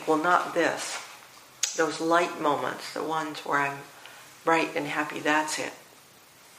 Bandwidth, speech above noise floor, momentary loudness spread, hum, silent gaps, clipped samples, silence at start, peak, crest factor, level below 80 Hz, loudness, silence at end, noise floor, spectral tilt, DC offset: 15.5 kHz; 27 dB; 18 LU; none; none; under 0.1%; 0 s; -6 dBFS; 22 dB; -78 dBFS; -27 LUFS; 0.75 s; -54 dBFS; -3 dB/octave; under 0.1%